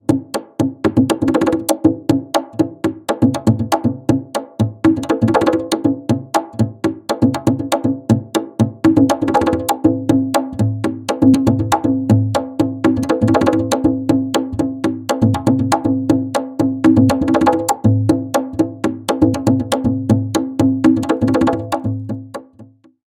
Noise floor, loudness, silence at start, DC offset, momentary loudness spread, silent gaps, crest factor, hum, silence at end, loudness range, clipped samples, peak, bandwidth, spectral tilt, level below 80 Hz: -44 dBFS; -16 LUFS; 0.1 s; under 0.1%; 7 LU; none; 16 dB; none; 0.4 s; 2 LU; under 0.1%; 0 dBFS; 16.5 kHz; -6.5 dB/octave; -46 dBFS